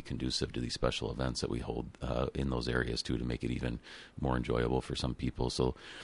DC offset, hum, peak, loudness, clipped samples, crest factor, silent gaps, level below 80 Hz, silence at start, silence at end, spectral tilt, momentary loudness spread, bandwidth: under 0.1%; none; -14 dBFS; -35 LUFS; under 0.1%; 20 dB; none; -44 dBFS; 0 s; 0 s; -5.5 dB/octave; 5 LU; 11.5 kHz